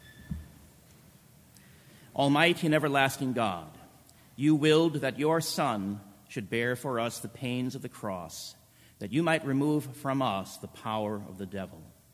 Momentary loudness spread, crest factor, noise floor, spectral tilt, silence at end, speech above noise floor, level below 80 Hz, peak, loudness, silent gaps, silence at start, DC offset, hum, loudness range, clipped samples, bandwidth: 18 LU; 22 dB; -57 dBFS; -5 dB/octave; 0.25 s; 28 dB; -60 dBFS; -8 dBFS; -29 LUFS; none; 0.05 s; under 0.1%; none; 6 LU; under 0.1%; 16 kHz